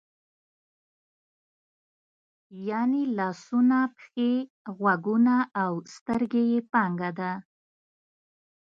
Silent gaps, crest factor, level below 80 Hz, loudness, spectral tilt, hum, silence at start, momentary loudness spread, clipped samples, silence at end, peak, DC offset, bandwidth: 4.50-4.65 s, 6.01-6.06 s; 18 dB; -70 dBFS; -26 LUFS; -7.5 dB/octave; none; 2.5 s; 10 LU; under 0.1%; 1.25 s; -10 dBFS; under 0.1%; 7.4 kHz